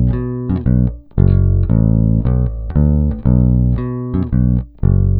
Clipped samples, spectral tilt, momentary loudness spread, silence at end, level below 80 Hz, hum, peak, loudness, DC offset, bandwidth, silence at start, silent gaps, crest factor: under 0.1%; -14.5 dB/octave; 6 LU; 0 s; -20 dBFS; none; 0 dBFS; -15 LUFS; under 0.1%; 2.8 kHz; 0 s; none; 14 dB